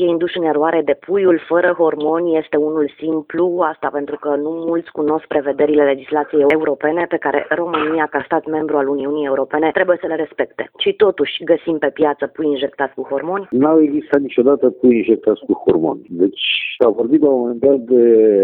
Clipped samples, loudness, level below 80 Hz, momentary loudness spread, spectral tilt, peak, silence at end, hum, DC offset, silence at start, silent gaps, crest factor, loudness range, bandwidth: under 0.1%; -16 LUFS; -58 dBFS; 7 LU; -8.5 dB/octave; 0 dBFS; 0 s; none; under 0.1%; 0 s; none; 16 dB; 3 LU; 4.2 kHz